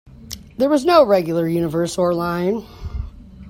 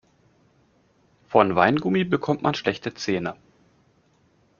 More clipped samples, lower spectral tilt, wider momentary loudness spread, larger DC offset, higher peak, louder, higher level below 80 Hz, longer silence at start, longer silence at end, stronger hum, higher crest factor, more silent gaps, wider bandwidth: neither; first, -6 dB/octave vs -4.5 dB/octave; first, 20 LU vs 9 LU; neither; about the same, 0 dBFS vs -2 dBFS; first, -18 LUFS vs -23 LUFS; first, -38 dBFS vs -62 dBFS; second, 0.05 s vs 1.3 s; second, 0 s vs 1.25 s; neither; second, 18 dB vs 24 dB; neither; first, 16.5 kHz vs 7.2 kHz